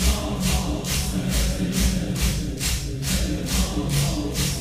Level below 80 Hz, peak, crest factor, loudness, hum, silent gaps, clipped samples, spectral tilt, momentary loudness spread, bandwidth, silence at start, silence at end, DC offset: -28 dBFS; -8 dBFS; 14 dB; -24 LUFS; none; none; under 0.1%; -4 dB/octave; 2 LU; 16 kHz; 0 s; 0 s; 0.1%